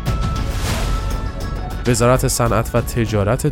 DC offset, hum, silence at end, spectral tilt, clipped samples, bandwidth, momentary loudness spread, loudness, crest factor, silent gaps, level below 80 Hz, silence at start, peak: under 0.1%; none; 0 s; -5.5 dB/octave; under 0.1%; 17 kHz; 10 LU; -19 LUFS; 16 dB; none; -24 dBFS; 0 s; -2 dBFS